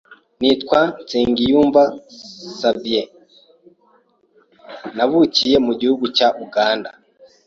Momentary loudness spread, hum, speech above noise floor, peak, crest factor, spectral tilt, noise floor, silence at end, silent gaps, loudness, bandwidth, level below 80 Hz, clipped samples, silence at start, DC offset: 20 LU; none; 41 dB; -2 dBFS; 18 dB; -4.5 dB/octave; -57 dBFS; 0.55 s; none; -17 LUFS; 7.6 kHz; -52 dBFS; under 0.1%; 0.1 s; under 0.1%